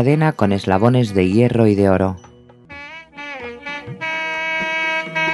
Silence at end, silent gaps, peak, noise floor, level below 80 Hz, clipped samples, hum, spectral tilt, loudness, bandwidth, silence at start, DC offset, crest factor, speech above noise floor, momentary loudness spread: 0 s; none; 0 dBFS; -40 dBFS; -54 dBFS; under 0.1%; none; -7 dB/octave; -17 LUFS; 12 kHz; 0 s; under 0.1%; 18 dB; 26 dB; 19 LU